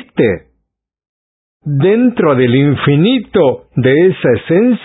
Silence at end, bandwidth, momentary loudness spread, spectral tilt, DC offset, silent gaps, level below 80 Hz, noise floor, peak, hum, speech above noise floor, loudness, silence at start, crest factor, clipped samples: 0 s; 4 kHz; 5 LU; -12.5 dB/octave; under 0.1%; 1.09-1.60 s; -44 dBFS; -69 dBFS; 0 dBFS; none; 59 dB; -12 LUFS; 0.15 s; 12 dB; under 0.1%